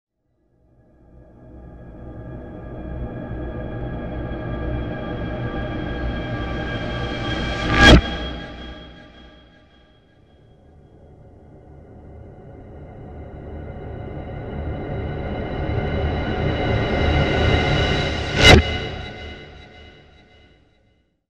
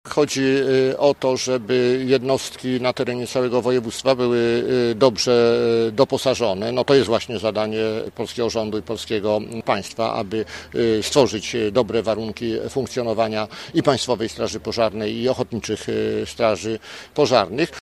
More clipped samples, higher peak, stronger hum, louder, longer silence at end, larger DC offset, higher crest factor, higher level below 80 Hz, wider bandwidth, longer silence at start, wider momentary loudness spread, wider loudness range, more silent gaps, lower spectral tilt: neither; about the same, 0 dBFS vs 0 dBFS; neither; about the same, -20 LUFS vs -21 LUFS; first, 1.45 s vs 0.05 s; neither; about the same, 22 dB vs 20 dB; first, -30 dBFS vs -52 dBFS; second, 13 kHz vs 14.5 kHz; first, 1.2 s vs 0.05 s; first, 26 LU vs 8 LU; first, 20 LU vs 4 LU; neither; about the same, -5 dB/octave vs -5 dB/octave